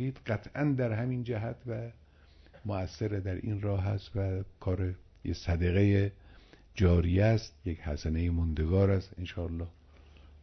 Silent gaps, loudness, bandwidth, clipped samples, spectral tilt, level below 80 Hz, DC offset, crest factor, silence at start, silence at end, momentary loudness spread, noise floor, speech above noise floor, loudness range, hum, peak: none; -32 LUFS; 6.4 kHz; under 0.1%; -8.5 dB/octave; -44 dBFS; under 0.1%; 18 dB; 0 s; 0.7 s; 13 LU; -58 dBFS; 28 dB; 6 LU; none; -14 dBFS